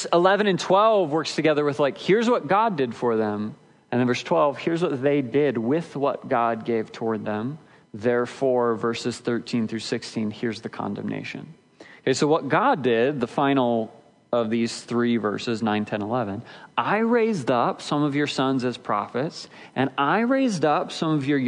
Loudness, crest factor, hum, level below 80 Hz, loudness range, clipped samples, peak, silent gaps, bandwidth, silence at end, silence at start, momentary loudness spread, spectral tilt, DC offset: -23 LUFS; 18 dB; none; -72 dBFS; 3 LU; under 0.1%; -6 dBFS; none; 10.5 kHz; 0 s; 0 s; 10 LU; -5.5 dB/octave; under 0.1%